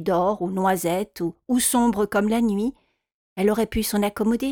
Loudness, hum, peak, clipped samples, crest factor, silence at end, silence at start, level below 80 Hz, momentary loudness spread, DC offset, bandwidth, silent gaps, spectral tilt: -23 LUFS; none; -8 dBFS; under 0.1%; 14 dB; 0 s; 0 s; -46 dBFS; 7 LU; under 0.1%; 19.5 kHz; 3.14-3.36 s; -4.5 dB/octave